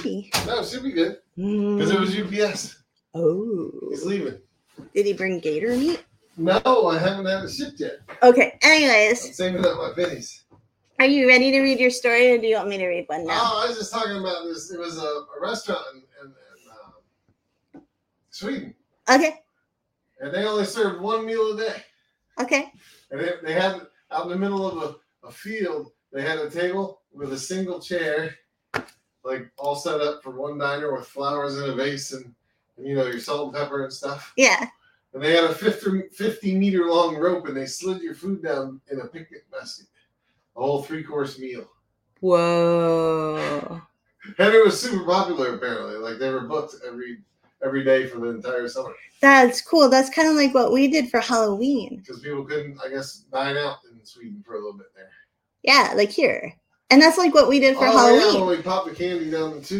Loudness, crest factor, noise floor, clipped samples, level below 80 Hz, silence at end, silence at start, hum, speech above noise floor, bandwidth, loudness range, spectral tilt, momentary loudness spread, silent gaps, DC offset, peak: -21 LUFS; 22 dB; -76 dBFS; under 0.1%; -62 dBFS; 0 s; 0 s; none; 54 dB; 16.5 kHz; 12 LU; -4 dB/octave; 19 LU; none; under 0.1%; 0 dBFS